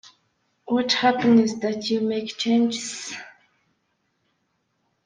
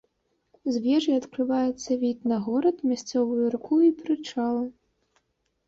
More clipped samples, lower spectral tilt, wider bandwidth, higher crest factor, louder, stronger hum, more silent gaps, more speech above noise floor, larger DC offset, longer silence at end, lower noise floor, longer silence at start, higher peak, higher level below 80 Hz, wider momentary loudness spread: neither; second, -4 dB/octave vs -5.5 dB/octave; first, 9.6 kHz vs 7.8 kHz; about the same, 18 dB vs 14 dB; first, -22 LUFS vs -26 LUFS; neither; neither; about the same, 51 dB vs 48 dB; neither; first, 1.75 s vs 0.95 s; about the same, -72 dBFS vs -73 dBFS; about the same, 0.65 s vs 0.65 s; first, -6 dBFS vs -12 dBFS; about the same, -68 dBFS vs -68 dBFS; first, 13 LU vs 8 LU